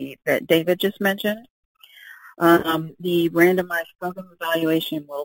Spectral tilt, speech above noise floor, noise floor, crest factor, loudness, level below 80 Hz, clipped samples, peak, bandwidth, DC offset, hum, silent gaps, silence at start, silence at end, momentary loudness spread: -5.5 dB/octave; 25 dB; -46 dBFS; 20 dB; -21 LUFS; -62 dBFS; under 0.1%; -2 dBFS; 17 kHz; under 0.1%; none; 1.50-1.75 s, 3.95-3.99 s; 0 s; 0 s; 13 LU